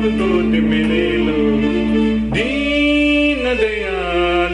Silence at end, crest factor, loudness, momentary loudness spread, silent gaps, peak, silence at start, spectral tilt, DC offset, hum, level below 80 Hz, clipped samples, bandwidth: 0 s; 10 dB; -16 LUFS; 4 LU; none; -6 dBFS; 0 s; -6 dB/octave; under 0.1%; none; -32 dBFS; under 0.1%; 10 kHz